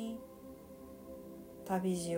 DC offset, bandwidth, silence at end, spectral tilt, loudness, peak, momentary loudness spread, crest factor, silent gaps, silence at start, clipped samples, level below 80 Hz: under 0.1%; 16 kHz; 0 s; -6 dB/octave; -41 LUFS; -22 dBFS; 17 LU; 20 dB; none; 0 s; under 0.1%; -66 dBFS